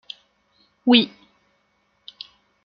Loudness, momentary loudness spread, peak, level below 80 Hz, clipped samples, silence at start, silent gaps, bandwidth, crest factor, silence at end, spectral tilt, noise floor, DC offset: -19 LUFS; 24 LU; -2 dBFS; -70 dBFS; under 0.1%; 0.85 s; none; 5.6 kHz; 24 dB; 1.55 s; -6 dB/octave; -67 dBFS; under 0.1%